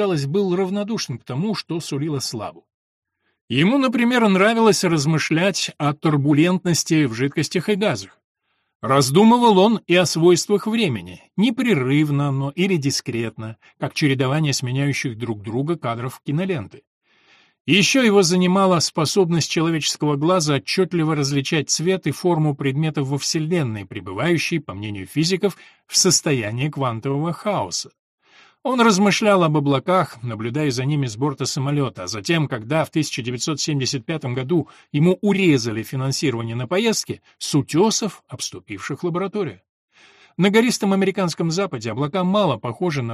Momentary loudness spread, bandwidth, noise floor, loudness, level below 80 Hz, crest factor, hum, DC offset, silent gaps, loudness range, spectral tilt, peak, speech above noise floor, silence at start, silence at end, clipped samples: 11 LU; 14.5 kHz; -56 dBFS; -20 LUFS; -60 dBFS; 16 dB; none; under 0.1%; 2.74-3.02 s, 3.41-3.48 s, 8.24-8.35 s, 8.75-8.80 s, 16.87-17.01 s, 17.60-17.65 s, 27.99-28.18 s, 39.69-39.88 s; 5 LU; -5 dB/octave; -2 dBFS; 36 dB; 0 s; 0 s; under 0.1%